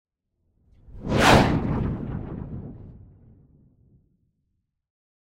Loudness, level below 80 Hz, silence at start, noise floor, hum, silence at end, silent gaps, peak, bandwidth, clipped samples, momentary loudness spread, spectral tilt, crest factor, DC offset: -22 LUFS; -38 dBFS; 0.9 s; -76 dBFS; none; 2.25 s; none; -2 dBFS; 16 kHz; under 0.1%; 22 LU; -5.5 dB/octave; 24 dB; under 0.1%